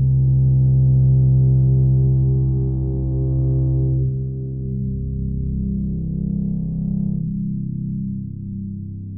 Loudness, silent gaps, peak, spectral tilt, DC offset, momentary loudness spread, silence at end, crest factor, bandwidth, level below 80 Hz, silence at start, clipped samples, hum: -20 LUFS; none; -8 dBFS; -19 dB/octave; under 0.1%; 11 LU; 0 s; 10 dB; 0.9 kHz; -28 dBFS; 0 s; under 0.1%; none